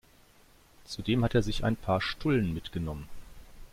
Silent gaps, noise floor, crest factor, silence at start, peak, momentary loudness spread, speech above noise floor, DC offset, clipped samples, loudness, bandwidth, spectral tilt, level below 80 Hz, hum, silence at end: none; -59 dBFS; 18 dB; 0.8 s; -12 dBFS; 14 LU; 30 dB; under 0.1%; under 0.1%; -30 LUFS; 16 kHz; -6.5 dB/octave; -44 dBFS; none; 0.05 s